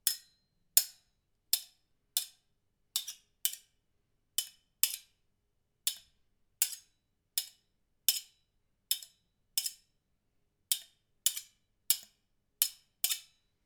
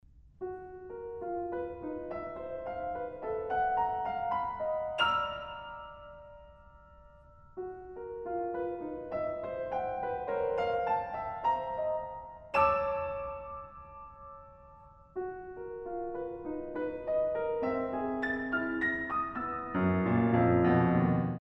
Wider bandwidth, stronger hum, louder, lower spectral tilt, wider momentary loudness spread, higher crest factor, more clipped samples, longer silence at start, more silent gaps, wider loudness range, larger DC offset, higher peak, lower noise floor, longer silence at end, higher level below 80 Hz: first, over 20 kHz vs 6.2 kHz; neither; about the same, -34 LUFS vs -33 LUFS; second, 4.5 dB/octave vs -8.5 dB/octave; second, 13 LU vs 17 LU; first, 34 dB vs 20 dB; neither; about the same, 0.05 s vs 0.15 s; neither; second, 3 LU vs 10 LU; neither; first, -4 dBFS vs -14 dBFS; first, -78 dBFS vs -56 dBFS; first, 0.45 s vs 0 s; second, -80 dBFS vs -58 dBFS